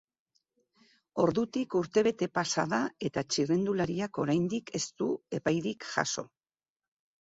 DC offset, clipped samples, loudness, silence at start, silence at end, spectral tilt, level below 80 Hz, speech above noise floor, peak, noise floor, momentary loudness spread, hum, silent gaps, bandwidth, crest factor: under 0.1%; under 0.1%; -31 LUFS; 1.15 s; 0.95 s; -4.5 dB/octave; -66 dBFS; over 60 dB; -12 dBFS; under -90 dBFS; 6 LU; none; none; 8 kHz; 20 dB